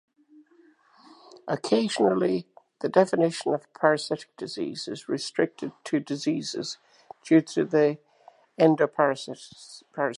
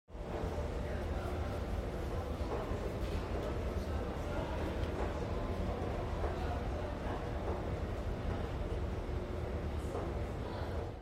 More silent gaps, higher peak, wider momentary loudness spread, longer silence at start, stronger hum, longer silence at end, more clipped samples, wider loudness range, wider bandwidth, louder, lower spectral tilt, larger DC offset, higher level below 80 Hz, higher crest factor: neither; first, -4 dBFS vs -22 dBFS; first, 16 LU vs 2 LU; first, 1.45 s vs 0.1 s; neither; about the same, 0 s vs 0 s; neither; about the same, 3 LU vs 1 LU; second, 11.5 kHz vs 15 kHz; first, -26 LUFS vs -39 LUFS; second, -5.5 dB/octave vs -7 dB/octave; neither; second, -78 dBFS vs -42 dBFS; first, 22 dB vs 14 dB